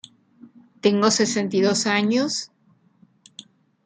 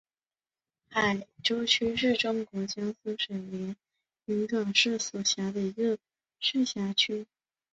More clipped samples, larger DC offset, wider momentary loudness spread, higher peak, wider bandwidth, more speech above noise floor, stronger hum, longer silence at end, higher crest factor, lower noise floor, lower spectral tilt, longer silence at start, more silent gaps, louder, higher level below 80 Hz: neither; neither; second, 8 LU vs 12 LU; first, -2 dBFS vs -10 dBFS; first, 9.6 kHz vs 8.2 kHz; second, 39 dB vs over 60 dB; neither; about the same, 0.45 s vs 0.5 s; about the same, 20 dB vs 22 dB; second, -59 dBFS vs under -90 dBFS; about the same, -3.5 dB/octave vs -3 dB/octave; second, 0.45 s vs 0.9 s; neither; first, -21 LUFS vs -29 LUFS; about the same, -70 dBFS vs -68 dBFS